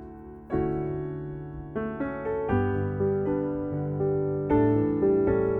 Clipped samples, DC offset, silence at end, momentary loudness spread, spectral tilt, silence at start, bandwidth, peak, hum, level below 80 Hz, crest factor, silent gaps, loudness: under 0.1%; under 0.1%; 0 s; 12 LU; -12 dB/octave; 0 s; 3.6 kHz; -10 dBFS; none; -46 dBFS; 16 dB; none; -27 LUFS